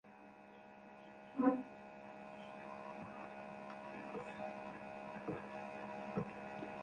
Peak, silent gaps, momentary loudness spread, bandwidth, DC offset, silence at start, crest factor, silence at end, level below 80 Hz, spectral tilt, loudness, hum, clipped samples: -20 dBFS; none; 19 LU; 9.6 kHz; under 0.1%; 0.05 s; 26 dB; 0 s; -76 dBFS; -7.5 dB/octave; -46 LUFS; none; under 0.1%